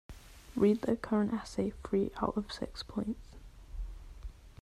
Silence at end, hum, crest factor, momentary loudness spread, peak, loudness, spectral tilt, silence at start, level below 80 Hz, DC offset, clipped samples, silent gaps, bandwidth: 0.1 s; none; 20 dB; 22 LU; -16 dBFS; -34 LUFS; -7 dB/octave; 0.1 s; -50 dBFS; under 0.1%; under 0.1%; none; 13 kHz